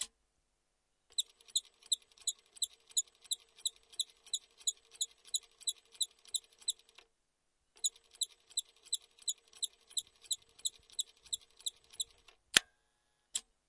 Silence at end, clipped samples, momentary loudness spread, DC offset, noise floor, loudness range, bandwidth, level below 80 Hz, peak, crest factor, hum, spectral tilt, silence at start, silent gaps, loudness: 0.3 s; under 0.1%; 6 LU; under 0.1%; -81 dBFS; 3 LU; 11.5 kHz; -80 dBFS; -4 dBFS; 38 dB; none; 2.5 dB/octave; 0 s; none; -38 LUFS